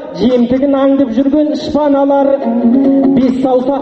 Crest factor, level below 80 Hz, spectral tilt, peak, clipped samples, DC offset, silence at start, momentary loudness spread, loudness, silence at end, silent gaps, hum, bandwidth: 10 dB; -42 dBFS; -7.5 dB/octave; 0 dBFS; under 0.1%; under 0.1%; 0 s; 3 LU; -11 LUFS; 0 s; none; none; 6.4 kHz